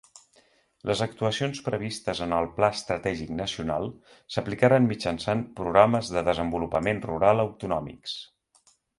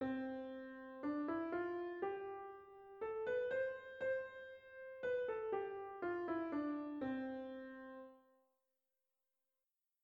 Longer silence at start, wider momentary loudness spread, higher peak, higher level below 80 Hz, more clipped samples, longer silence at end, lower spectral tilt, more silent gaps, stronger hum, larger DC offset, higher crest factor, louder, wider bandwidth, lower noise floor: first, 0.85 s vs 0 s; second, 11 LU vs 14 LU; first, -4 dBFS vs -30 dBFS; first, -52 dBFS vs -78 dBFS; neither; second, 0.75 s vs 1.85 s; second, -5.5 dB/octave vs -7.5 dB/octave; neither; neither; neither; first, 24 dB vs 16 dB; first, -26 LUFS vs -44 LUFS; first, 11.5 kHz vs 7 kHz; second, -64 dBFS vs under -90 dBFS